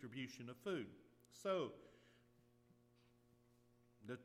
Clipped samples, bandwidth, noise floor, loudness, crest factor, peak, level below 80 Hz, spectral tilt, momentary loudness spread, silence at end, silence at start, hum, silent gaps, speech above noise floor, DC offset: under 0.1%; 15 kHz; -74 dBFS; -48 LUFS; 20 dB; -32 dBFS; -86 dBFS; -5.5 dB/octave; 22 LU; 0 s; 0 s; none; none; 27 dB; under 0.1%